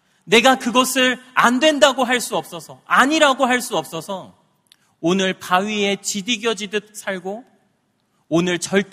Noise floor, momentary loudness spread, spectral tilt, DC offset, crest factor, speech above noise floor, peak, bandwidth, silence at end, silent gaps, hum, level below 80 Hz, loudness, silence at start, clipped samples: -66 dBFS; 14 LU; -3 dB/octave; under 0.1%; 20 dB; 47 dB; 0 dBFS; 15.5 kHz; 0.1 s; none; none; -64 dBFS; -18 LUFS; 0.25 s; under 0.1%